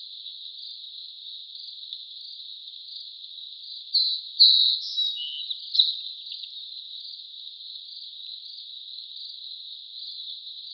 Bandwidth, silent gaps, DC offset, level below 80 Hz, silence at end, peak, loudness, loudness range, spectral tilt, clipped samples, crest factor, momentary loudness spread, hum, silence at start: 6.2 kHz; none; under 0.1%; under -90 dBFS; 0 s; -4 dBFS; -23 LUFS; 16 LU; 13.5 dB/octave; under 0.1%; 24 dB; 17 LU; none; 0 s